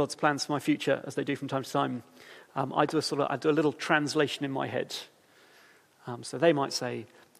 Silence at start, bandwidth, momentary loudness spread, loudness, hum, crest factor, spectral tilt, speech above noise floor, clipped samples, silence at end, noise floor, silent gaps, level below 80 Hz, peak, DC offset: 0 s; 15 kHz; 13 LU; -29 LUFS; none; 20 dB; -4.5 dB/octave; 30 dB; under 0.1%; 0.35 s; -59 dBFS; none; -78 dBFS; -10 dBFS; under 0.1%